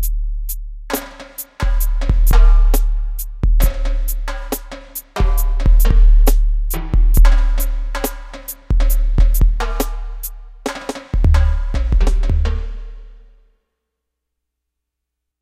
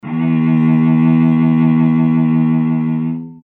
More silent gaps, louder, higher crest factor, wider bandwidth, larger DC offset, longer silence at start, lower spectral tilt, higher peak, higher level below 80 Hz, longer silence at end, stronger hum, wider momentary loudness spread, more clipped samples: neither; second, -19 LUFS vs -13 LUFS; about the same, 14 dB vs 10 dB; first, 15.5 kHz vs 3.7 kHz; neither; about the same, 0 s vs 0.05 s; second, -5.5 dB/octave vs -11.5 dB/octave; first, 0 dBFS vs -4 dBFS; first, -14 dBFS vs -50 dBFS; first, 2.3 s vs 0.1 s; neither; first, 15 LU vs 5 LU; neither